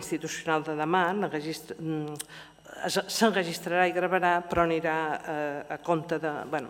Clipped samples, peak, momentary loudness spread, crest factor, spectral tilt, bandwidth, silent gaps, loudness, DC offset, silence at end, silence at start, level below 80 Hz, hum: under 0.1%; -8 dBFS; 11 LU; 20 dB; -4.5 dB/octave; 17 kHz; none; -28 LUFS; under 0.1%; 0 s; 0 s; -60 dBFS; none